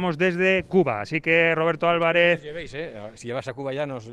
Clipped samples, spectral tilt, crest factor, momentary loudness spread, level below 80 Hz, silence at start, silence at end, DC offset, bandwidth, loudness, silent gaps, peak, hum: under 0.1%; -6 dB/octave; 18 dB; 15 LU; -56 dBFS; 0 s; 0 s; under 0.1%; 10 kHz; -22 LUFS; none; -6 dBFS; none